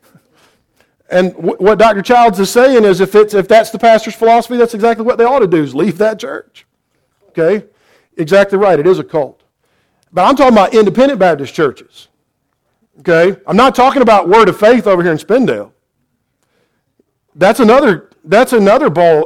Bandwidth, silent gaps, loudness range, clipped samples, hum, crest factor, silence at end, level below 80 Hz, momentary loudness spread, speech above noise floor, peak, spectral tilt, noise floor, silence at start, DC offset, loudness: 16.5 kHz; none; 5 LU; under 0.1%; none; 10 dB; 0 s; -46 dBFS; 9 LU; 56 dB; 0 dBFS; -5.5 dB/octave; -65 dBFS; 1.1 s; under 0.1%; -10 LUFS